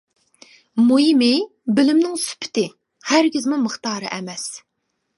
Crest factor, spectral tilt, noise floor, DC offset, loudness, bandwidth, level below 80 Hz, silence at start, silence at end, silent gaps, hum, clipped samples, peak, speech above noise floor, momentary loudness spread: 20 dB; -3.5 dB/octave; -51 dBFS; under 0.1%; -19 LUFS; 11.5 kHz; -72 dBFS; 0.75 s; 0.6 s; none; none; under 0.1%; 0 dBFS; 32 dB; 13 LU